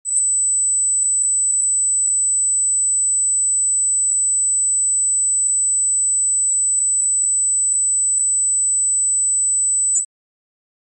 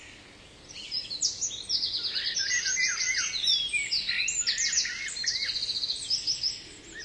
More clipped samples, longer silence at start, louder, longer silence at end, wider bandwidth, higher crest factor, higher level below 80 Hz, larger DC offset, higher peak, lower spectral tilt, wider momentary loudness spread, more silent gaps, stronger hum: neither; about the same, 0.05 s vs 0 s; first, -14 LUFS vs -27 LUFS; first, 0.95 s vs 0 s; second, 9.2 kHz vs 11 kHz; second, 10 dB vs 18 dB; second, under -90 dBFS vs -60 dBFS; neither; first, -8 dBFS vs -12 dBFS; second, 8.5 dB/octave vs 2.5 dB/octave; second, 0 LU vs 9 LU; neither; neither